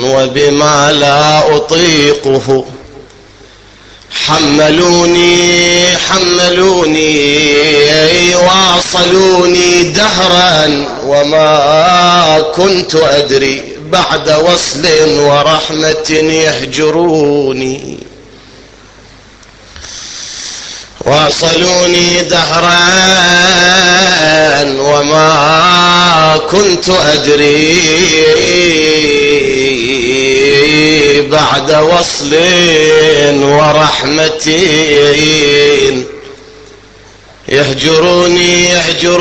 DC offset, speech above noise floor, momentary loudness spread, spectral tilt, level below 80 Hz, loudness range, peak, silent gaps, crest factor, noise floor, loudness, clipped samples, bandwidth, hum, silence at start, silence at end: 0.2%; 29 dB; 6 LU; -3 dB/octave; -36 dBFS; 5 LU; 0 dBFS; none; 8 dB; -37 dBFS; -7 LUFS; 0.3%; 9 kHz; none; 0 s; 0 s